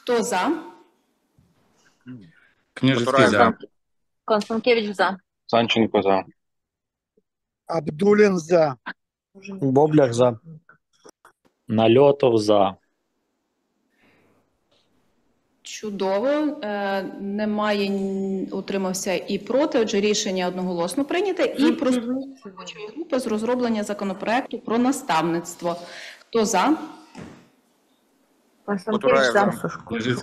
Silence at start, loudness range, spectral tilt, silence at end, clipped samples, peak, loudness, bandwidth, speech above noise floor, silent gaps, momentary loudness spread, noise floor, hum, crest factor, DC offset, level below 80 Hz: 0.05 s; 6 LU; -5 dB/octave; 0 s; under 0.1%; -2 dBFS; -22 LUFS; 14.5 kHz; 63 dB; none; 19 LU; -85 dBFS; none; 22 dB; under 0.1%; -64 dBFS